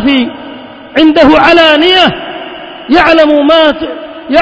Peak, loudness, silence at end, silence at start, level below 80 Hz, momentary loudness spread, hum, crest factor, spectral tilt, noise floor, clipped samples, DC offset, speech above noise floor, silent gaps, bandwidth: 0 dBFS; -6 LUFS; 0 s; 0 s; -36 dBFS; 20 LU; none; 8 dB; -5 dB/octave; -27 dBFS; 3%; under 0.1%; 21 dB; none; 8 kHz